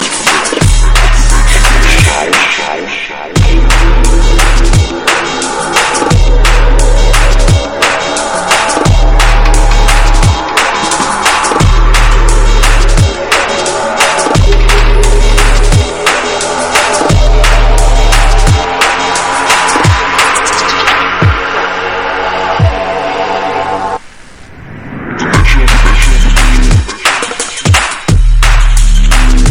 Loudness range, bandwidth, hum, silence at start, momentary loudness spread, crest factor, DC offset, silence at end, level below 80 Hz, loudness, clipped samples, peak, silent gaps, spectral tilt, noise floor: 3 LU; 14.5 kHz; none; 0 s; 5 LU; 6 dB; 2%; 0 s; -8 dBFS; -9 LUFS; 1%; 0 dBFS; none; -3.5 dB/octave; -32 dBFS